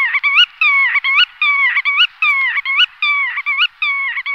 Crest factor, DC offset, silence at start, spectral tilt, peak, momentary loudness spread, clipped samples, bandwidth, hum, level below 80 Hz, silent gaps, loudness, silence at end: 14 dB; under 0.1%; 0 s; 5 dB/octave; -2 dBFS; 5 LU; under 0.1%; 7.8 kHz; none; -68 dBFS; none; -12 LUFS; 0 s